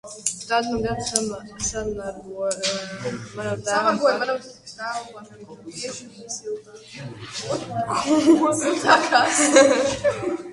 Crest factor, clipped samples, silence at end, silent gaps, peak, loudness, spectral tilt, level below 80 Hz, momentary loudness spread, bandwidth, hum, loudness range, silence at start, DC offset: 22 dB; under 0.1%; 0 s; none; 0 dBFS; -21 LUFS; -3 dB/octave; -52 dBFS; 19 LU; 11.5 kHz; none; 13 LU; 0.05 s; under 0.1%